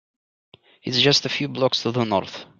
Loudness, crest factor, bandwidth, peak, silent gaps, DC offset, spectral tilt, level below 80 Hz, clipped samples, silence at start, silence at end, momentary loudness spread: -20 LUFS; 20 dB; 8.8 kHz; -4 dBFS; none; under 0.1%; -4 dB/octave; -62 dBFS; under 0.1%; 0.85 s; 0.15 s; 9 LU